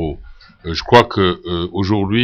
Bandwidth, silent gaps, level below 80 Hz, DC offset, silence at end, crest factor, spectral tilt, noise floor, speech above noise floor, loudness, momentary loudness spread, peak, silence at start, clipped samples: 13 kHz; none; -36 dBFS; under 0.1%; 0 s; 16 dB; -6.5 dB/octave; -38 dBFS; 23 dB; -16 LUFS; 16 LU; 0 dBFS; 0 s; 0.1%